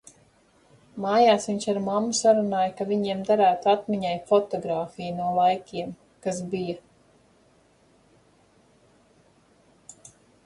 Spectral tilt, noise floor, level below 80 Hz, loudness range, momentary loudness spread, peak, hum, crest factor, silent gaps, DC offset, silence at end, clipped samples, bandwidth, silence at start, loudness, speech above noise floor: -4.5 dB/octave; -60 dBFS; -66 dBFS; 14 LU; 14 LU; -8 dBFS; none; 18 dB; none; under 0.1%; 3.65 s; under 0.1%; 11.5 kHz; 0.95 s; -24 LUFS; 37 dB